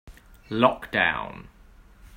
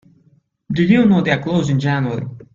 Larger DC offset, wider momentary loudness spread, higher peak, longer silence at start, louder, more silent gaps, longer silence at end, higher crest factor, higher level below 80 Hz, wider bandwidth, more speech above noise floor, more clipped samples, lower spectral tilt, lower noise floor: neither; first, 16 LU vs 11 LU; about the same, -4 dBFS vs -2 dBFS; second, 0.05 s vs 0.7 s; second, -24 LUFS vs -16 LUFS; neither; about the same, 0 s vs 0.1 s; first, 24 dB vs 16 dB; about the same, -50 dBFS vs -50 dBFS; first, 16 kHz vs 7.6 kHz; second, 27 dB vs 41 dB; neither; second, -6 dB/octave vs -7.5 dB/octave; second, -51 dBFS vs -56 dBFS